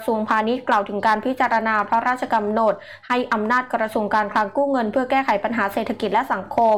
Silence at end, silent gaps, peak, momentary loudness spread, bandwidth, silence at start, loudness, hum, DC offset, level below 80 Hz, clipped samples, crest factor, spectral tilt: 0 s; none; -8 dBFS; 4 LU; 17.5 kHz; 0 s; -21 LUFS; none; 0.2%; -58 dBFS; under 0.1%; 12 dB; -5.5 dB/octave